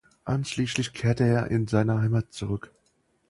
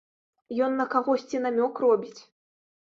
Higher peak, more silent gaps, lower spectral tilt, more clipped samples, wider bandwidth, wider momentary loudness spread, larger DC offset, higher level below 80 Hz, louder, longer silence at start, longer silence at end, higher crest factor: about the same, -8 dBFS vs -10 dBFS; neither; about the same, -6.5 dB/octave vs -5.5 dB/octave; neither; first, 11.5 kHz vs 7.4 kHz; first, 9 LU vs 6 LU; neither; first, -52 dBFS vs -76 dBFS; about the same, -26 LUFS vs -26 LUFS; second, 0.25 s vs 0.5 s; about the same, 0.7 s vs 0.75 s; about the same, 18 dB vs 18 dB